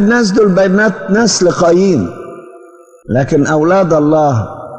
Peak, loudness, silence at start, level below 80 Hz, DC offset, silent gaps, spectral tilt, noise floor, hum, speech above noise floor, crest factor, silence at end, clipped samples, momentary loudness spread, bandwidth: -2 dBFS; -11 LUFS; 0 s; -44 dBFS; under 0.1%; none; -5.5 dB/octave; -39 dBFS; none; 29 dB; 10 dB; 0 s; under 0.1%; 8 LU; 9.2 kHz